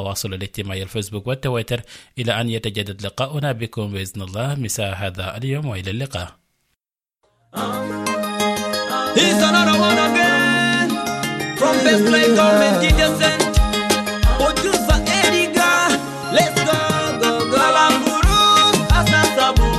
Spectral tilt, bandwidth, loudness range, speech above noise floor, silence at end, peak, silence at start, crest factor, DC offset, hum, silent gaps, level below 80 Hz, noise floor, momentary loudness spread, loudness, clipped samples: -4 dB/octave; 16 kHz; 11 LU; 59 dB; 0 s; -4 dBFS; 0 s; 14 dB; under 0.1%; none; none; -28 dBFS; -78 dBFS; 13 LU; -17 LUFS; under 0.1%